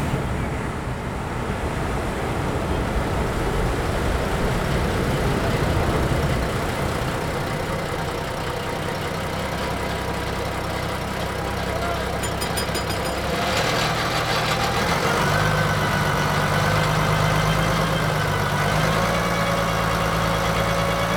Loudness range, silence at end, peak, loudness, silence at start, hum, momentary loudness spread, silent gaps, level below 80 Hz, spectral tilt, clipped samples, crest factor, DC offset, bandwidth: 5 LU; 0 s; -6 dBFS; -23 LUFS; 0 s; none; 6 LU; none; -32 dBFS; -5 dB/octave; under 0.1%; 16 dB; under 0.1%; over 20 kHz